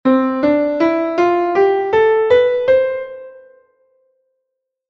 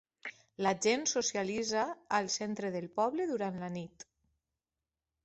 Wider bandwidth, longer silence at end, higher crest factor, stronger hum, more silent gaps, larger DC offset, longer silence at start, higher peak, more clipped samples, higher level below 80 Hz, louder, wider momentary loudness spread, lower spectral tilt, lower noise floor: second, 6.6 kHz vs 8.2 kHz; first, 1.6 s vs 1.2 s; second, 14 dB vs 20 dB; neither; neither; neither; second, 0.05 s vs 0.25 s; first, -2 dBFS vs -16 dBFS; neither; first, -54 dBFS vs -74 dBFS; first, -15 LUFS vs -34 LUFS; second, 8 LU vs 14 LU; first, -6.5 dB/octave vs -3 dB/octave; second, -76 dBFS vs under -90 dBFS